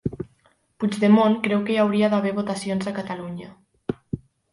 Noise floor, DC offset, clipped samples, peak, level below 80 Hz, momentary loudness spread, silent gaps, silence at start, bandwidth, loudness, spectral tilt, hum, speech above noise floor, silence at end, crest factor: -62 dBFS; under 0.1%; under 0.1%; -6 dBFS; -54 dBFS; 18 LU; none; 0.05 s; 11.5 kHz; -22 LUFS; -6.5 dB/octave; none; 41 dB; 0.35 s; 18 dB